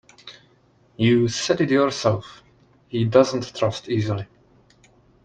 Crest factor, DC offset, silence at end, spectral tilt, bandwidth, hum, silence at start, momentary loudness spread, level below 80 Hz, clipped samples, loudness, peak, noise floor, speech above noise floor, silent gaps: 20 dB; under 0.1%; 1 s; -5.5 dB/octave; 9.2 kHz; none; 0.25 s; 19 LU; -58 dBFS; under 0.1%; -21 LUFS; -2 dBFS; -58 dBFS; 38 dB; none